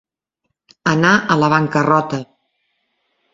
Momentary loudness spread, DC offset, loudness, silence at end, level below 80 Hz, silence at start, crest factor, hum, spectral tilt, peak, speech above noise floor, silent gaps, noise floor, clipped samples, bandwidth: 10 LU; under 0.1%; -15 LUFS; 1.1 s; -56 dBFS; 0.85 s; 18 dB; none; -6 dB/octave; 0 dBFS; 60 dB; none; -75 dBFS; under 0.1%; 7.8 kHz